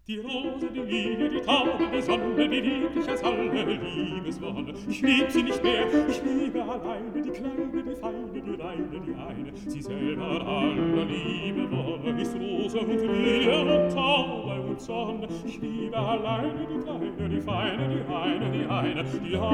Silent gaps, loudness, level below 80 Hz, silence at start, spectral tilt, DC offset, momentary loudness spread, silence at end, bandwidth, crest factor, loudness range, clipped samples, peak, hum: none; -28 LUFS; -52 dBFS; 0.1 s; -6 dB/octave; under 0.1%; 11 LU; 0 s; 13 kHz; 18 dB; 6 LU; under 0.1%; -10 dBFS; none